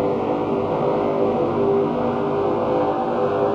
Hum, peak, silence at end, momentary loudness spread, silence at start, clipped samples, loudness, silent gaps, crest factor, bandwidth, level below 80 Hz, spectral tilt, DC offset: none; -8 dBFS; 0 s; 2 LU; 0 s; under 0.1%; -21 LUFS; none; 12 dB; 7 kHz; -50 dBFS; -8.5 dB/octave; under 0.1%